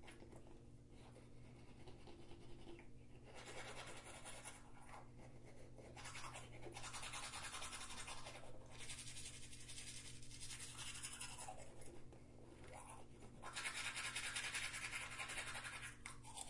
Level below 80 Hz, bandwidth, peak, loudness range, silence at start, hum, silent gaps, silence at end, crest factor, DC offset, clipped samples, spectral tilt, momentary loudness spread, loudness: -66 dBFS; 11.5 kHz; -32 dBFS; 11 LU; 0 s; none; none; 0 s; 20 dB; under 0.1%; under 0.1%; -2 dB/octave; 17 LU; -51 LUFS